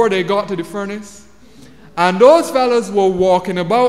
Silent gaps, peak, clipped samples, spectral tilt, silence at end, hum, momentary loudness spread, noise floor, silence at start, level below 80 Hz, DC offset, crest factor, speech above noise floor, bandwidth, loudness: none; 0 dBFS; under 0.1%; -5.5 dB/octave; 0 s; none; 15 LU; -43 dBFS; 0 s; -50 dBFS; 0.6%; 14 dB; 29 dB; 14.5 kHz; -14 LUFS